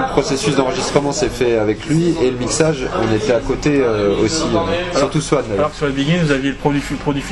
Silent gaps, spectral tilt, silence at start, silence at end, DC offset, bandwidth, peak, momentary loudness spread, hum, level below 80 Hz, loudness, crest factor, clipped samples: none; -5 dB/octave; 0 s; 0 s; under 0.1%; 12 kHz; 0 dBFS; 3 LU; none; -34 dBFS; -17 LUFS; 16 dB; under 0.1%